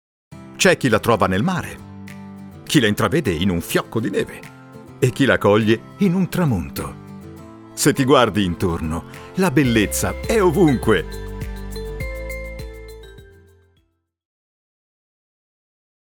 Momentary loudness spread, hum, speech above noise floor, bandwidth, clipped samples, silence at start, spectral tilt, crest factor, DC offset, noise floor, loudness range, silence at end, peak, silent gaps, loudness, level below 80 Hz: 22 LU; none; 47 dB; over 20 kHz; under 0.1%; 0.3 s; -5 dB/octave; 20 dB; under 0.1%; -65 dBFS; 14 LU; 3 s; -2 dBFS; none; -19 LUFS; -38 dBFS